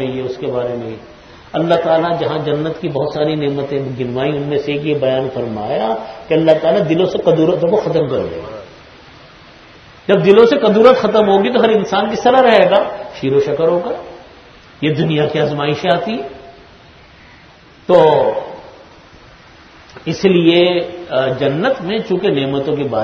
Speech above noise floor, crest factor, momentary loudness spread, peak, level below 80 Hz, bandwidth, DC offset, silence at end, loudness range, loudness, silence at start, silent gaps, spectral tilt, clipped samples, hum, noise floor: 29 dB; 14 dB; 15 LU; 0 dBFS; -50 dBFS; 6.6 kHz; under 0.1%; 0 s; 6 LU; -14 LUFS; 0 s; none; -7 dB/octave; under 0.1%; none; -43 dBFS